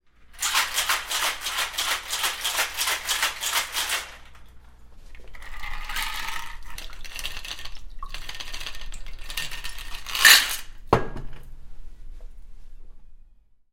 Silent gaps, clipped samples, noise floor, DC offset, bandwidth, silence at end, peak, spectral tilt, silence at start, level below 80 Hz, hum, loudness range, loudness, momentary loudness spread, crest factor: none; under 0.1%; -53 dBFS; under 0.1%; 16.5 kHz; 0.55 s; 0 dBFS; -0.5 dB/octave; 0.2 s; -40 dBFS; none; 14 LU; -23 LUFS; 18 LU; 26 dB